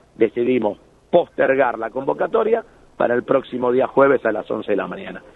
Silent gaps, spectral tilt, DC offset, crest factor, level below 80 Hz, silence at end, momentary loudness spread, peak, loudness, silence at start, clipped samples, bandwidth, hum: none; -8 dB/octave; under 0.1%; 18 dB; -56 dBFS; 0.15 s; 9 LU; -2 dBFS; -19 LUFS; 0.2 s; under 0.1%; 4.1 kHz; none